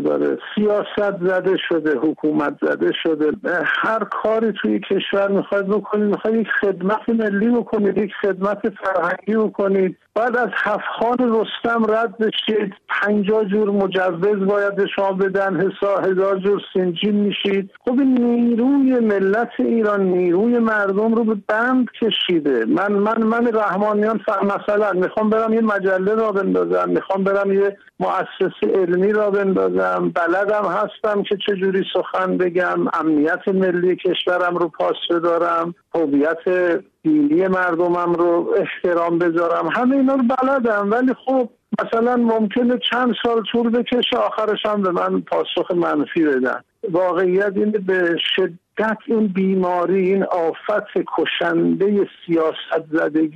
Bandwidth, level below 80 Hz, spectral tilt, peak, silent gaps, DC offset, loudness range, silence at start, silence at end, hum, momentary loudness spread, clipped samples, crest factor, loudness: 7.4 kHz; -62 dBFS; -7.5 dB/octave; -8 dBFS; none; under 0.1%; 2 LU; 0 s; 0 s; none; 4 LU; under 0.1%; 10 dB; -19 LUFS